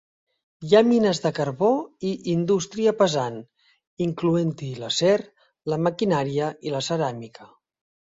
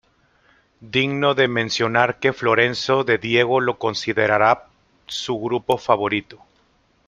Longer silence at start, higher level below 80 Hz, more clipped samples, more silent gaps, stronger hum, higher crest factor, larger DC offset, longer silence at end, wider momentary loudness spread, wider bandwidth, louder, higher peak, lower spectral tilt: second, 0.6 s vs 0.8 s; second, -64 dBFS vs -58 dBFS; neither; first, 3.87-3.97 s vs none; neither; about the same, 20 dB vs 20 dB; neither; about the same, 0.65 s vs 0.7 s; first, 11 LU vs 7 LU; second, 7.8 kHz vs 13.5 kHz; second, -23 LUFS vs -19 LUFS; second, -4 dBFS vs 0 dBFS; about the same, -5.5 dB/octave vs -4.5 dB/octave